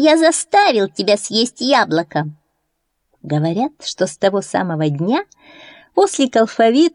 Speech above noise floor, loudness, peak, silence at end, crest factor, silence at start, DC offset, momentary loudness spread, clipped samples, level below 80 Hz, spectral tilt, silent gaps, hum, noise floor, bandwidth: 55 dB; -16 LUFS; -2 dBFS; 0.05 s; 14 dB; 0 s; under 0.1%; 9 LU; under 0.1%; -66 dBFS; -4.5 dB/octave; none; none; -71 dBFS; 11 kHz